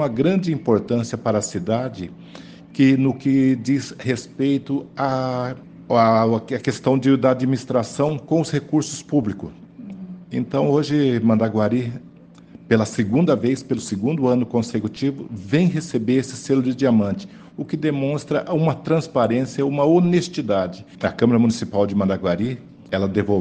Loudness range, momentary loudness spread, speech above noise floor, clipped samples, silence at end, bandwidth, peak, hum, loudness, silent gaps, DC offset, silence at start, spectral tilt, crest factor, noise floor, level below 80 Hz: 2 LU; 12 LU; 25 dB; under 0.1%; 0 s; 9.6 kHz; -2 dBFS; none; -20 LUFS; none; under 0.1%; 0 s; -7 dB/octave; 18 dB; -44 dBFS; -56 dBFS